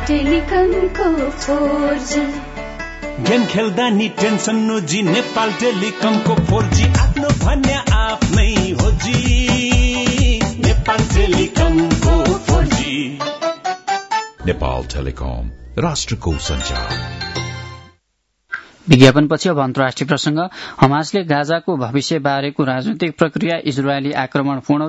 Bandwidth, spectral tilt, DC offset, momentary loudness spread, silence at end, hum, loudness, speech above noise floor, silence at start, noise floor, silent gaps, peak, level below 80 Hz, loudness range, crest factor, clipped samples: 8 kHz; -5.5 dB/octave; under 0.1%; 9 LU; 0 s; none; -17 LUFS; 52 dB; 0 s; -68 dBFS; none; 0 dBFS; -24 dBFS; 6 LU; 16 dB; under 0.1%